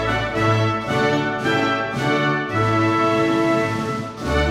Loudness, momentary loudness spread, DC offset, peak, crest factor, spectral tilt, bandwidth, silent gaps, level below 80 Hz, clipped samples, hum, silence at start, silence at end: -20 LUFS; 4 LU; under 0.1%; -6 dBFS; 14 dB; -6 dB/octave; 13.5 kHz; none; -36 dBFS; under 0.1%; none; 0 s; 0 s